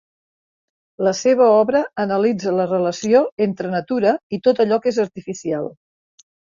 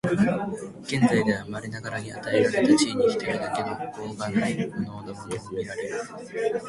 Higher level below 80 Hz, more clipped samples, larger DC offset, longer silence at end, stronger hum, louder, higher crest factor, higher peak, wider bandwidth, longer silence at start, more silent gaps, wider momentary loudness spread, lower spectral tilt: about the same, -62 dBFS vs -58 dBFS; neither; neither; first, 0.75 s vs 0 s; neither; first, -18 LUFS vs -26 LUFS; about the same, 16 dB vs 18 dB; first, -4 dBFS vs -8 dBFS; second, 7.4 kHz vs 11.5 kHz; first, 1 s vs 0.05 s; first, 3.32-3.37 s, 4.23-4.30 s vs none; second, 11 LU vs 14 LU; about the same, -5.5 dB/octave vs -5.5 dB/octave